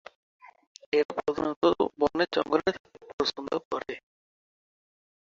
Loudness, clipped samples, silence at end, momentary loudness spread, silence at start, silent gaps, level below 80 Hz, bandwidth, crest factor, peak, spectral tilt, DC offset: -28 LUFS; under 0.1%; 1.25 s; 13 LU; 0.95 s; 1.05-1.09 s, 1.56-1.61 s, 2.80-2.84 s, 3.13-3.18 s, 3.65-3.71 s; -62 dBFS; 7.6 kHz; 20 dB; -10 dBFS; -5 dB/octave; under 0.1%